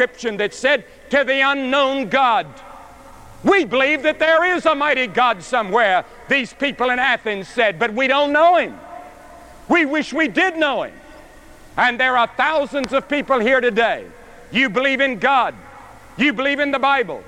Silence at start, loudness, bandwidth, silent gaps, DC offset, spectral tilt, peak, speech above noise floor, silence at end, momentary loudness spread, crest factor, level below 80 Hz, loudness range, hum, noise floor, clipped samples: 0 s; -17 LUFS; 12.5 kHz; none; under 0.1%; -4 dB/octave; -4 dBFS; 25 dB; 0 s; 7 LU; 14 dB; -50 dBFS; 2 LU; none; -42 dBFS; under 0.1%